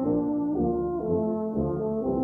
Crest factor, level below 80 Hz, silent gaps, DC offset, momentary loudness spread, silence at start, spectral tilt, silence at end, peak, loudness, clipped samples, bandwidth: 12 dB; -46 dBFS; none; under 0.1%; 2 LU; 0 s; -13.5 dB/octave; 0 s; -14 dBFS; -27 LUFS; under 0.1%; 1.9 kHz